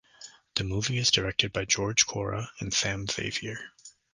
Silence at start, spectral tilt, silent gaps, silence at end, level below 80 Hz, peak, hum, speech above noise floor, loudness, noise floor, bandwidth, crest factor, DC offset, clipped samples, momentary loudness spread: 0.2 s; -2.5 dB/octave; none; 0.25 s; -50 dBFS; -8 dBFS; none; 23 dB; -27 LUFS; -52 dBFS; 11 kHz; 22 dB; under 0.1%; under 0.1%; 16 LU